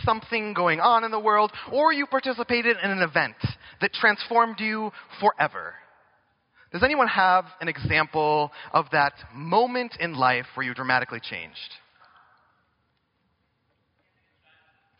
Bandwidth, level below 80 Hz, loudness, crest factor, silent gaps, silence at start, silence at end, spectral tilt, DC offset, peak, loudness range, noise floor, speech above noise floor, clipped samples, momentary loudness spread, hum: 5.6 kHz; -56 dBFS; -23 LUFS; 22 dB; none; 0 s; 3.25 s; -2.5 dB/octave; under 0.1%; -4 dBFS; 6 LU; -72 dBFS; 48 dB; under 0.1%; 13 LU; none